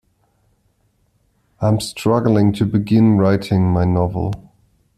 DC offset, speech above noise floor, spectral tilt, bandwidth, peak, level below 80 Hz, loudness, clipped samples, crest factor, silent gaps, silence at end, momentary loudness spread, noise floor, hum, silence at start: under 0.1%; 47 dB; -7.5 dB/octave; 13.5 kHz; -2 dBFS; -44 dBFS; -17 LUFS; under 0.1%; 16 dB; none; 0.6 s; 8 LU; -62 dBFS; none; 1.6 s